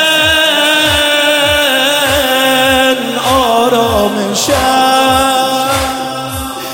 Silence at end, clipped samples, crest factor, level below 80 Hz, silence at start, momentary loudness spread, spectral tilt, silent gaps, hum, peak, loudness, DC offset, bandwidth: 0 s; under 0.1%; 10 dB; -34 dBFS; 0 s; 6 LU; -2.5 dB/octave; none; none; 0 dBFS; -10 LUFS; 0.3%; 17 kHz